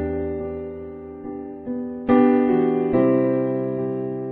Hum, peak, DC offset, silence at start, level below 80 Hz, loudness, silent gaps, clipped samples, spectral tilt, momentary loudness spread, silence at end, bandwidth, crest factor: none; -4 dBFS; under 0.1%; 0 s; -48 dBFS; -21 LUFS; none; under 0.1%; -11.5 dB/octave; 16 LU; 0 s; 4 kHz; 16 dB